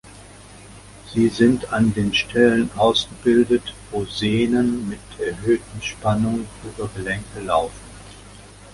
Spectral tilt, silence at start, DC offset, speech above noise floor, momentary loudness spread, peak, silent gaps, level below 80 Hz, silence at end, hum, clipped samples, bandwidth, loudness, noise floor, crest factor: -5.5 dB/octave; 0.05 s; under 0.1%; 23 dB; 14 LU; -2 dBFS; none; -44 dBFS; 0.05 s; none; under 0.1%; 11.5 kHz; -21 LUFS; -43 dBFS; 18 dB